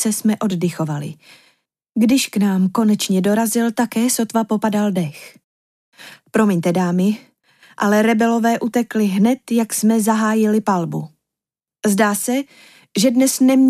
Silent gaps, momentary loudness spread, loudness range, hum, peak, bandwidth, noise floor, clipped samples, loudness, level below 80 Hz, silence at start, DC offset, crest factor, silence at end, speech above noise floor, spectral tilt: 5.44-5.92 s; 9 LU; 3 LU; none; -4 dBFS; 16 kHz; -89 dBFS; under 0.1%; -18 LUFS; -66 dBFS; 0 s; under 0.1%; 14 dB; 0 s; 72 dB; -5 dB/octave